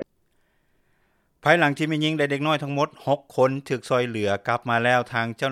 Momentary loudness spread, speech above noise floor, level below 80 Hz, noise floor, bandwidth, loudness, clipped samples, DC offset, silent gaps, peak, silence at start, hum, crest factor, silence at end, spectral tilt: 7 LU; 44 dB; -68 dBFS; -66 dBFS; 14.5 kHz; -23 LUFS; under 0.1%; under 0.1%; none; -2 dBFS; 0 s; none; 22 dB; 0 s; -5.5 dB/octave